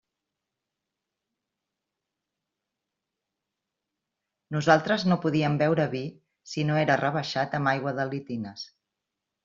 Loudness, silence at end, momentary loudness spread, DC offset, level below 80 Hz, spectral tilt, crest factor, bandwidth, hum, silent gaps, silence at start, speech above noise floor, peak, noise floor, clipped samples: -26 LUFS; 0.8 s; 14 LU; under 0.1%; -68 dBFS; -5 dB/octave; 24 dB; 7.6 kHz; none; none; 4.5 s; 60 dB; -4 dBFS; -86 dBFS; under 0.1%